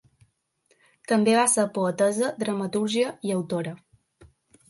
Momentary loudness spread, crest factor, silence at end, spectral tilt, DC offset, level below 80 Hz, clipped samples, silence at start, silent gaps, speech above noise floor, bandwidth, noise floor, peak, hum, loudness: 11 LU; 18 dB; 0.45 s; -4 dB/octave; under 0.1%; -68 dBFS; under 0.1%; 1.1 s; none; 44 dB; 12 kHz; -68 dBFS; -8 dBFS; none; -24 LUFS